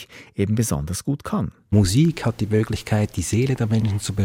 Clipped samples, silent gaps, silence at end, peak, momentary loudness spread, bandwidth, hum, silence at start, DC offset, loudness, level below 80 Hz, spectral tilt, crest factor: under 0.1%; none; 0 s; -6 dBFS; 8 LU; 16.5 kHz; none; 0 s; under 0.1%; -22 LUFS; -40 dBFS; -6 dB/octave; 16 dB